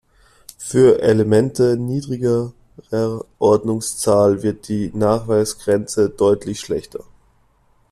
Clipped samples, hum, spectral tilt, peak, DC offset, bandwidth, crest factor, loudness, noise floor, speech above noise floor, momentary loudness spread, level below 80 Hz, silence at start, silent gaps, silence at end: under 0.1%; none; -6 dB/octave; -2 dBFS; under 0.1%; 13.5 kHz; 16 dB; -18 LUFS; -57 dBFS; 40 dB; 11 LU; -50 dBFS; 0.6 s; none; 0.9 s